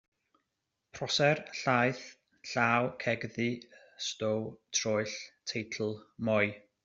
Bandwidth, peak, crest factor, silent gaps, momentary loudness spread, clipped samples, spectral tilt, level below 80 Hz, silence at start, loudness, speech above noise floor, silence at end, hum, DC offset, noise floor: 8 kHz; -10 dBFS; 22 dB; none; 12 LU; under 0.1%; -4 dB/octave; -72 dBFS; 0.95 s; -32 LUFS; 53 dB; 0.25 s; none; under 0.1%; -85 dBFS